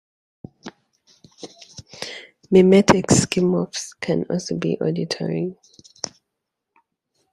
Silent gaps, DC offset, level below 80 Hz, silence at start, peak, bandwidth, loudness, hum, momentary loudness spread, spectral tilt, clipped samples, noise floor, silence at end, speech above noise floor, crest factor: none; under 0.1%; -54 dBFS; 0.65 s; 0 dBFS; 12.5 kHz; -19 LUFS; none; 26 LU; -5 dB/octave; under 0.1%; -80 dBFS; 1.25 s; 62 dB; 22 dB